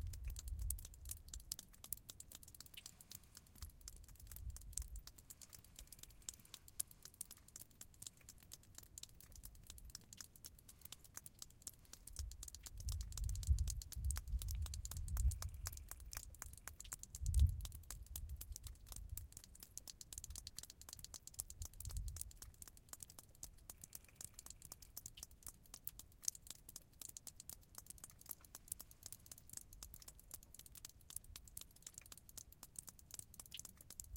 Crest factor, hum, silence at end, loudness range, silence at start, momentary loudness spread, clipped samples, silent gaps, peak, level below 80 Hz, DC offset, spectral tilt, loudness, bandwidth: 32 dB; none; 0 s; 10 LU; 0 s; 12 LU; under 0.1%; none; -18 dBFS; -52 dBFS; under 0.1%; -2.5 dB/octave; -51 LUFS; 17 kHz